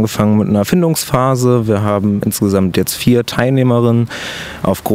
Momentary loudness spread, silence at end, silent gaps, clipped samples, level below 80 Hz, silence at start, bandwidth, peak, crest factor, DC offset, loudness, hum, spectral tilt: 6 LU; 0 s; none; under 0.1%; -42 dBFS; 0 s; 16.5 kHz; 0 dBFS; 12 dB; under 0.1%; -14 LUFS; none; -6 dB/octave